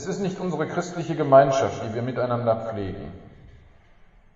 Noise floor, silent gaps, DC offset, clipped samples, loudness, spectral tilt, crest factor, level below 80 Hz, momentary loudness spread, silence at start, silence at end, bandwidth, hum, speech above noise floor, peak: -53 dBFS; none; under 0.1%; under 0.1%; -23 LUFS; -6.5 dB/octave; 22 dB; -52 dBFS; 15 LU; 0 s; 0.8 s; 7.8 kHz; none; 29 dB; -4 dBFS